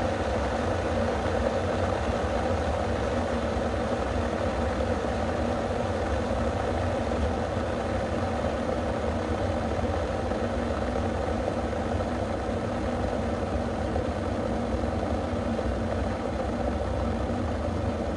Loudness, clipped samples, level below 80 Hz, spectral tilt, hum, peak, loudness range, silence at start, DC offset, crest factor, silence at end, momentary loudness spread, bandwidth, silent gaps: -29 LUFS; under 0.1%; -36 dBFS; -6.5 dB/octave; none; -12 dBFS; 2 LU; 0 s; under 0.1%; 16 dB; 0 s; 2 LU; 11 kHz; none